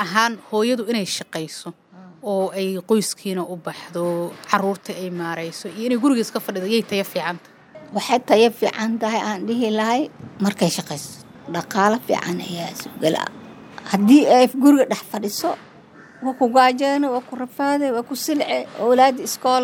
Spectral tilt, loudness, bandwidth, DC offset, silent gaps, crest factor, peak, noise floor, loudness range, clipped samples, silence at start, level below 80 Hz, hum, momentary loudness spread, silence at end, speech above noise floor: -4.5 dB/octave; -20 LUFS; 19.5 kHz; under 0.1%; none; 20 dB; 0 dBFS; -45 dBFS; 6 LU; under 0.1%; 0 s; -70 dBFS; none; 15 LU; 0 s; 25 dB